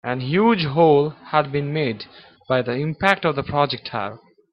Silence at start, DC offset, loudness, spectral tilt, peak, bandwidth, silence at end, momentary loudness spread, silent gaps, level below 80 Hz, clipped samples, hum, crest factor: 0.05 s; under 0.1%; -20 LUFS; -7.5 dB/octave; 0 dBFS; 10.5 kHz; 0.35 s; 12 LU; none; -54 dBFS; under 0.1%; none; 20 dB